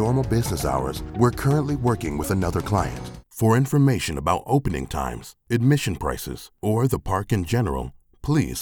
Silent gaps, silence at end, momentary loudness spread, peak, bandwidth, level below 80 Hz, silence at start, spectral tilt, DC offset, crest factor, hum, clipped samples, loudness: none; 0 s; 11 LU; -4 dBFS; 19.5 kHz; -38 dBFS; 0 s; -6.5 dB/octave; under 0.1%; 18 dB; none; under 0.1%; -23 LUFS